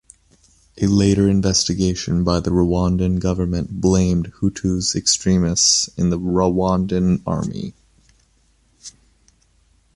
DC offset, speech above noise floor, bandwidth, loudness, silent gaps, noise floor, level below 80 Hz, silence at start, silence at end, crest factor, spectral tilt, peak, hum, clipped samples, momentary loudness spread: under 0.1%; 41 dB; 11.5 kHz; -18 LUFS; none; -59 dBFS; -34 dBFS; 0.75 s; 1.05 s; 18 dB; -5 dB/octave; -2 dBFS; none; under 0.1%; 8 LU